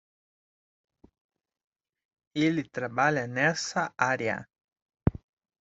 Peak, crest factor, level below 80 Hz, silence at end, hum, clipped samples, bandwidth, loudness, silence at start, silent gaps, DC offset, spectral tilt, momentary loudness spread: -8 dBFS; 24 dB; -52 dBFS; 0.45 s; none; under 0.1%; 8 kHz; -28 LUFS; 2.35 s; 4.64-4.68 s, 4.82-4.86 s; under 0.1%; -5 dB/octave; 7 LU